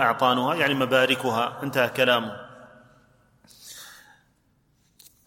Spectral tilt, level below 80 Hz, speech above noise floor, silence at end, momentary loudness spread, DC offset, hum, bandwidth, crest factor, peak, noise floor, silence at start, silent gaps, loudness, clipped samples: -4.5 dB/octave; -68 dBFS; 43 dB; 1.35 s; 22 LU; under 0.1%; none; 17 kHz; 20 dB; -6 dBFS; -66 dBFS; 0 s; none; -22 LUFS; under 0.1%